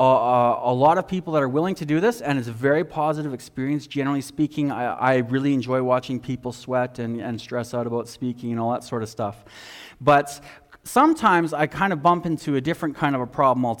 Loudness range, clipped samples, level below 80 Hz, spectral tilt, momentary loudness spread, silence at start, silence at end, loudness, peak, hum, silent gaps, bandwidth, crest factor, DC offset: 6 LU; under 0.1%; -58 dBFS; -6.5 dB/octave; 11 LU; 0 s; 0 s; -23 LUFS; -6 dBFS; none; none; 18 kHz; 16 dB; under 0.1%